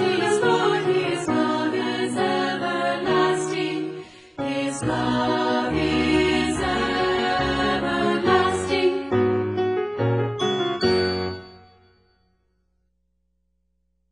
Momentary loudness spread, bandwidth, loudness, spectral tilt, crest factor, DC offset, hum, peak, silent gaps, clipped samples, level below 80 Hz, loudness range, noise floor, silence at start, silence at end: 6 LU; 10.5 kHz; -22 LUFS; -5 dB/octave; 16 dB; under 0.1%; none; -6 dBFS; none; under 0.1%; -46 dBFS; 5 LU; -71 dBFS; 0 s; 2.55 s